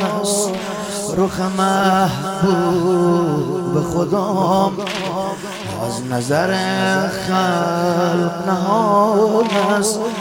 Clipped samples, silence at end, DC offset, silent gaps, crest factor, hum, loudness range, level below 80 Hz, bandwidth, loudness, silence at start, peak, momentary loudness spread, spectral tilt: under 0.1%; 0 s; under 0.1%; none; 14 dB; none; 3 LU; -50 dBFS; 17 kHz; -17 LUFS; 0 s; -4 dBFS; 8 LU; -5 dB/octave